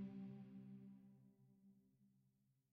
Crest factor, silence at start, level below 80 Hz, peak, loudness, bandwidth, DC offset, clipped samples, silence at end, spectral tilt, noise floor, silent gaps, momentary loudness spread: 16 dB; 0 s; under -90 dBFS; -44 dBFS; -59 LUFS; 5 kHz; under 0.1%; under 0.1%; 0.2 s; -9.5 dB/octave; -82 dBFS; none; 12 LU